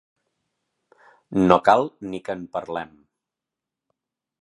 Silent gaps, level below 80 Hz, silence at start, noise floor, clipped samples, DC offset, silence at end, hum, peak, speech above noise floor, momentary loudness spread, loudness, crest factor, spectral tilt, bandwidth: none; -56 dBFS; 1.3 s; -87 dBFS; under 0.1%; under 0.1%; 1.55 s; none; 0 dBFS; 66 dB; 16 LU; -22 LUFS; 24 dB; -7 dB/octave; 11.5 kHz